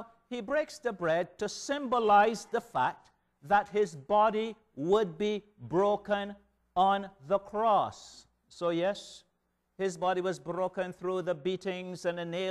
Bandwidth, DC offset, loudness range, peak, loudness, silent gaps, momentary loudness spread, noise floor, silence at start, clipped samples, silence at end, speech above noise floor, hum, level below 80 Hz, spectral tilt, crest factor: 12.5 kHz; under 0.1%; 5 LU; -12 dBFS; -31 LUFS; none; 10 LU; -78 dBFS; 0 s; under 0.1%; 0 s; 47 dB; none; -66 dBFS; -5 dB/octave; 18 dB